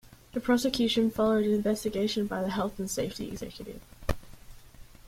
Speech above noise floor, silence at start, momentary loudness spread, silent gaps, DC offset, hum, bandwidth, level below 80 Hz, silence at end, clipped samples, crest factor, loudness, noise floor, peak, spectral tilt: 21 dB; 0.1 s; 14 LU; none; under 0.1%; none; 16.5 kHz; -48 dBFS; 0 s; under 0.1%; 20 dB; -29 LUFS; -50 dBFS; -10 dBFS; -5 dB/octave